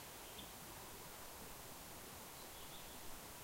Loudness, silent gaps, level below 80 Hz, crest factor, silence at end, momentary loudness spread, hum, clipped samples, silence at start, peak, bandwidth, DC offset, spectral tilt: -53 LUFS; none; -66 dBFS; 14 dB; 0 s; 1 LU; none; under 0.1%; 0 s; -38 dBFS; 16 kHz; under 0.1%; -2.5 dB/octave